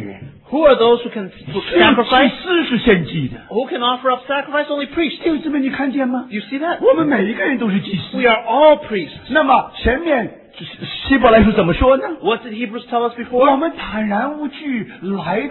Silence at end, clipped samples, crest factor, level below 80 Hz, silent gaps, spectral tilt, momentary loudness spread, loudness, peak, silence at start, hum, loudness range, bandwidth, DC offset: 0 s; under 0.1%; 16 dB; -36 dBFS; none; -9 dB/octave; 13 LU; -16 LUFS; 0 dBFS; 0 s; none; 4 LU; 4.3 kHz; under 0.1%